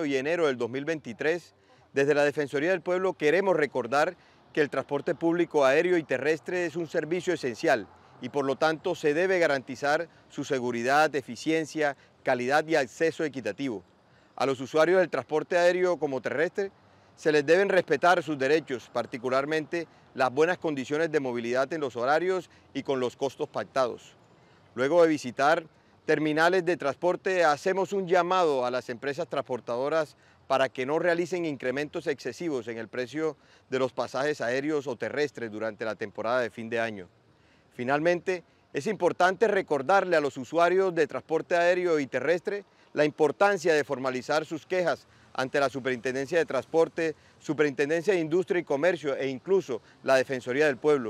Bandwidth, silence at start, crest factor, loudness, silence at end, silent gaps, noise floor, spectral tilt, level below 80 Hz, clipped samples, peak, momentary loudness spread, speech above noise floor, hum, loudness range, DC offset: 14 kHz; 0 s; 18 dB; -27 LUFS; 0 s; none; -61 dBFS; -5 dB/octave; -76 dBFS; under 0.1%; -10 dBFS; 10 LU; 34 dB; none; 5 LU; under 0.1%